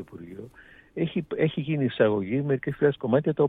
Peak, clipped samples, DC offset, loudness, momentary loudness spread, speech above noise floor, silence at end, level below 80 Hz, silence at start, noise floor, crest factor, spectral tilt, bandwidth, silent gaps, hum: -8 dBFS; under 0.1%; under 0.1%; -26 LUFS; 18 LU; 27 dB; 0 s; -60 dBFS; 0 s; -52 dBFS; 18 dB; -10 dB/octave; 4 kHz; none; none